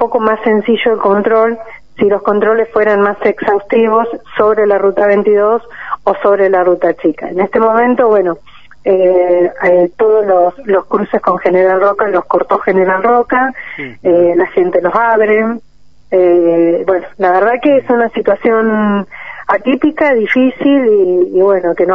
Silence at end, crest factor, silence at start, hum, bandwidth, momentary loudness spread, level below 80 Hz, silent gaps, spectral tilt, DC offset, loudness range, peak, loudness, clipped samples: 0 s; 10 dB; 0 s; none; 5.4 kHz; 6 LU; -50 dBFS; none; -8.5 dB/octave; 1%; 1 LU; 0 dBFS; -11 LUFS; under 0.1%